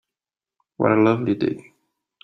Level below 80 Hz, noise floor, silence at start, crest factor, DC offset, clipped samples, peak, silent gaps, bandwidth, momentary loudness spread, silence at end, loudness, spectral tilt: -62 dBFS; -90 dBFS; 0.8 s; 20 dB; under 0.1%; under 0.1%; -2 dBFS; none; 6 kHz; 9 LU; 0.65 s; -20 LUFS; -9 dB/octave